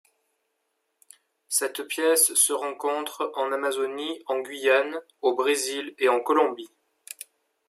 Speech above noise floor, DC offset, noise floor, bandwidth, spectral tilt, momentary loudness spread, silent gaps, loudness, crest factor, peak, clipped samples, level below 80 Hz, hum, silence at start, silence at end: 52 dB; under 0.1%; -77 dBFS; 16 kHz; 0.5 dB/octave; 14 LU; none; -24 LUFS; 20 dB; -8 dBFS; under 0.1%; -86 dBFS; none; 1.5 s; 0.45 s